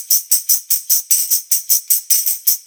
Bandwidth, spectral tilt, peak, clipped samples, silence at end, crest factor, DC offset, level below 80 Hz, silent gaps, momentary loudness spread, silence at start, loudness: over 20 kHz; 7 dB/octave; 0 dBFS; under 0.1%; 0.05 s; 16 dB; under 0.1%; -78 dBFS; none; 2 LU; 0 s; -13 LUFS